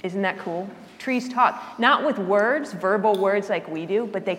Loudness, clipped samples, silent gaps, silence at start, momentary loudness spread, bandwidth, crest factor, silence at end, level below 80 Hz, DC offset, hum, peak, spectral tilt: -23 LUFS; under 0.1%; none; 0.05 s; 10 LU; 15.5 kHz; 20 dB; 0 s; -74 dBFS; under 0.1%; none; -2 dBFS; -5.5 dB/octave